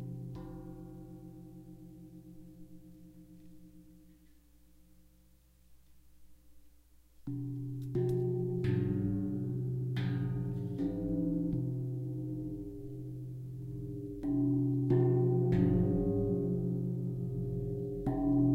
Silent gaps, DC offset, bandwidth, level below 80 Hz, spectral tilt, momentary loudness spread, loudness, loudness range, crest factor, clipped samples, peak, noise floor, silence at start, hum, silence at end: none; under 0.1%; 4.6 kHz; -52 dBFS; -10.5 dB/octave; 23 LU; -34 LUFS; 21 LU; 18 dB; under 0.1%; -16 dBFS; -64 dBFS; 0 s; none; 0 s